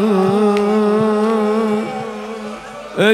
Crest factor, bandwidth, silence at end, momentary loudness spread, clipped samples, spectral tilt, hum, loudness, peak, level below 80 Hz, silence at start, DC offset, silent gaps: 14 dB; 13 kHz; 0 s; 13 LU; under 0.1%; -6.5 dB/octave; none; -16 LUFS; -2 dBFS; -56 dBFS; 0 s; under 0.1%; none